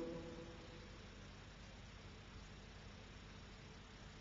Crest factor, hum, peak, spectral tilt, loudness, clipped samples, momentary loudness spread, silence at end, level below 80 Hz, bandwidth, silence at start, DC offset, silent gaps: 18 dB; 50 Hz at -60 dBFS; -36 dBFS; -4.5 dB/octave; -56 LUFS; under 0.1%; 4 LU; 0 s; -62 dBFS; 7.4 kHz; 0 s; under 0.1%; none